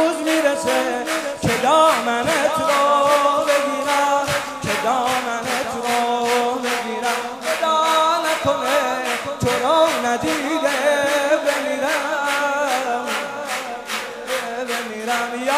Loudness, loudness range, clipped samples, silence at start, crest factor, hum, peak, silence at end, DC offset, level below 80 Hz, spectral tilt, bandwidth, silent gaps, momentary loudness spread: -19 LUFS; 4 LU; under 0.1%; 0 s; 16 dB; none; -4 dBFS; 0 s; under 0.1%; -54 dBFS; -3 dB/octave; 16 kHz; none; 8 LU